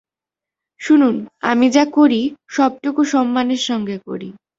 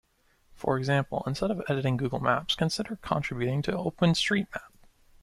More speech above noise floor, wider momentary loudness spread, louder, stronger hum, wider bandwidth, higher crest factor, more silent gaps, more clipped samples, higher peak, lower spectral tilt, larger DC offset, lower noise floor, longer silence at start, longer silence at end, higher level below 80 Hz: first, 72 dB vs 37 dB; first, 13 LU vs 6 LU; first, -16 LUFS vs -28 LUFS; neither; second, 7.8 kHz vs 14.5 kHz; about the same, 16 dB vs 20 dB; neither; neither; first, -2 dBFS vs -10 dBFS; about the same, -4.5 dB/octave vs -5.5 dB/octave; neither; first, -88 dBFS vs -65 dBFS; first, 0.8 s vs 0.55 s; second, 0.25 s vs 0.55 s; second, -62 dBFS vs -54 dBFS